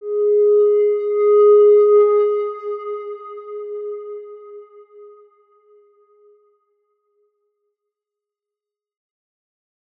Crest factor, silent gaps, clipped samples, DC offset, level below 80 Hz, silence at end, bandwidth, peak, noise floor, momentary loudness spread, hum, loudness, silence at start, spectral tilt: 14 dB; none; under 0.1%; under 0.1%; under -90 dBFS; 4.95 s; 3.1 kHz; -4 dBFS; -88 dBFS; 22 LU; none; -15 LUFS; 0 s; -7 dB/octave